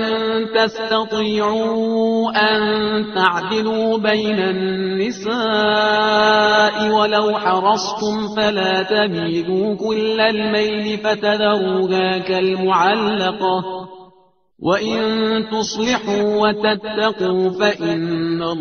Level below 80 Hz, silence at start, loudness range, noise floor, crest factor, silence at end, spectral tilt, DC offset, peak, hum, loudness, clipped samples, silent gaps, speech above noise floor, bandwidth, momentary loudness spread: -56 dBFS; 0 s; 3 LU; -55 dBFS; 18 dB; 0 s; -2.5 dB/octave; under 0.1%; 0 dBFS; none; -17 LUFS; under 0.1%; none; 38 dB; 6.8 kHz; 5 LU